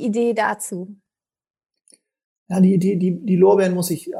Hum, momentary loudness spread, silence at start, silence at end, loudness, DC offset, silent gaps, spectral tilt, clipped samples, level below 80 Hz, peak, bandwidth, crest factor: none; 14 LU; 0 s; 0 s; -18 LUFS; under 0.1%; 1.50-1.54 s, 2.24-2.46 s; -6.5 dB/octave; under 0.1%; -70 dBFS; -4 dBFS; 15.5 kHz; 16 dB